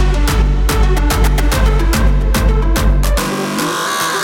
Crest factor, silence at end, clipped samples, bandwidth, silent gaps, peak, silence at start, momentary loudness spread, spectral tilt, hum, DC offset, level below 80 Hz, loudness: 12 dB; 0 s; under 0.1%; 16.5 kHz; none; 0 dBFS; 0 s; 2 LU; -4.5 dB/octave; none; under 0.1%; -14 dBFS; -15 LUFS